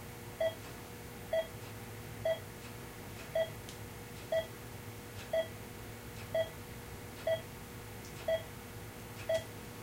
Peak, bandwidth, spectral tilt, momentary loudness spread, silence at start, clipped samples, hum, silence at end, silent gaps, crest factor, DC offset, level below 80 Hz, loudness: -24 dBFS; 16 kHz; -4.5 dB/octave; 10 LU; 0 s; under 0.1%; none; 0 s; none; 16 dB; under 0.1%; -58 dBFS; -41 LUFS